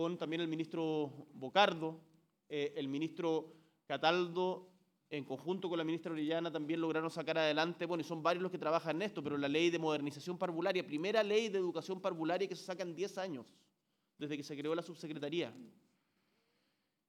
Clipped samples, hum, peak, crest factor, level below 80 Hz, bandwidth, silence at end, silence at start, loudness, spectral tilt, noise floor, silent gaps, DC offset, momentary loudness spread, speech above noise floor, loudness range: under 0.1%; none; -14 dBFS; 24 dB; under -90 dBFS; 13.5 kHz; 1.4 s; 0 s; -38 LUFS; -5.5 dB/octave; -83 dBFS; none; under 0.1%; 11 LU; 46 dB; 7 LU